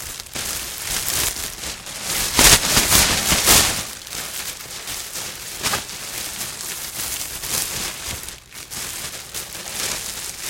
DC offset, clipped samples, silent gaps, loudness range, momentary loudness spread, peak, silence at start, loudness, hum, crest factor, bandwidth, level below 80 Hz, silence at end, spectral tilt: under 0.1%; under 0.1%; none; 11 LU; 16 LU; 0 dBFS; 0 s; -19 LUFS; none; 22 dB; 17 kHz; -38 dBFS; 0 s; -1 dB/octave